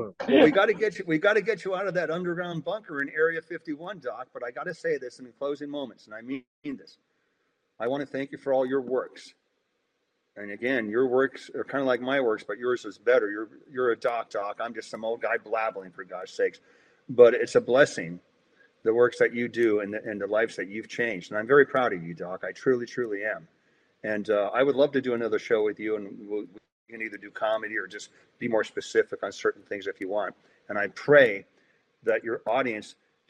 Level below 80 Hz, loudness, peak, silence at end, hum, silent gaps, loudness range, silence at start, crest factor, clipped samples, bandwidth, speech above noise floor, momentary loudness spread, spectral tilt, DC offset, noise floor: -76 dBFS; -27 LUFS; -4 dBFS; 0.4 s; none; 6.47-6.62 s, 26.72-26.86 s; 7 LU; 0 s; 24 dB; under 0.1%; 9.6 kHz; 49 dB; 16 LU; -5.5 dB/octave; under 0.1%; -76 dBFS